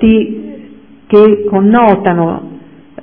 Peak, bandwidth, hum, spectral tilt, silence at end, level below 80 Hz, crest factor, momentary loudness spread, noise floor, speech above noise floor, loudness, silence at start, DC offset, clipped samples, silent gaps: 0 dBFS; 4.1 kHz; none; -11 dB/octave; 0.45 s; -38 dBFS; 10 dB; 17 LU; -36 dBFS; 28 dB; -9 LUFS; 0 s; 0.5%; 0.8%; none